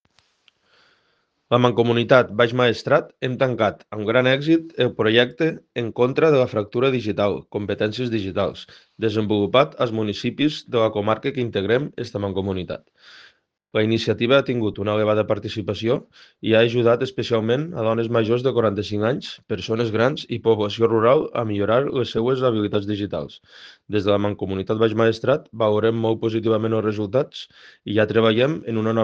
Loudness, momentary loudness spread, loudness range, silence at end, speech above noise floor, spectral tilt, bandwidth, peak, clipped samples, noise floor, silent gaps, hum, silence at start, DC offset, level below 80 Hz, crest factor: -21 LUFS; 9 LU; 3 LU; 0 s; 47 dB; -7 dB/octave; 7.6 kHz; 0 dBFS; under 0.1%; -67 dBFS; none; none; 1.5 s; under 0.1%; -60 dBFS; 20 dB